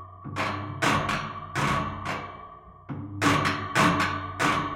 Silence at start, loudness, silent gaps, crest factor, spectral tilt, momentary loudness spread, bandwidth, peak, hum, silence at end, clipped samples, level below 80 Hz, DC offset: 0 s; -26 LUFS; none; 18 dB; -4.5 dB/octave; 16 LU; 16.5 kHz; -8 dBFS; none; 0 s; under 0.1%; -50 dBFS; under 0.1%